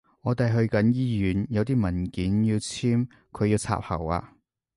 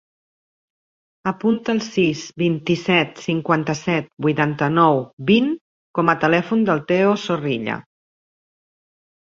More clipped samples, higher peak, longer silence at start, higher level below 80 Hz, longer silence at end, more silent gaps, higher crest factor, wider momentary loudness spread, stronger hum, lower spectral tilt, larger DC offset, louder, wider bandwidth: neither; second, -10 dBFS vs -2 dBFS; second, 0.25 s vs 1.25 s; first, -44 dBFS vs -60 dBFS; second, 0.5 s vs 1.55 s; second, none vs 4.13-4.17 s, 5.13-5.17 s, 5.61-5.94 s; about the same, 16 dB vs 20 dB; about the same, 6 LU vs 8 LU; neither; about the same, -7 dB/octave vs -6 dB/octave; neither; second, -26 LUFS vs -20 LUFS; first, 11.5 kHz vs 7.6 kHz